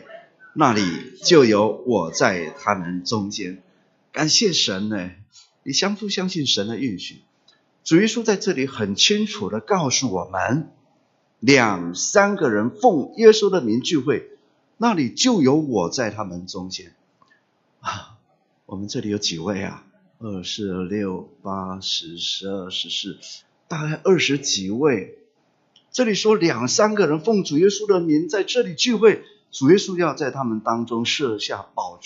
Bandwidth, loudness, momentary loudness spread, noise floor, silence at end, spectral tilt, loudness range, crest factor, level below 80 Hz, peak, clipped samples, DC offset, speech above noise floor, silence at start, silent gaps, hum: 7.8 kHz; -20 LUFS; 15 LU; -64 dBFS; 0.1 s; -4 dB/octave; 9 LU; 22 dB; -66 dBFS; 0 dBFS; under 0.1%; under 0.1%; 44 dB; 0.1 s; none; none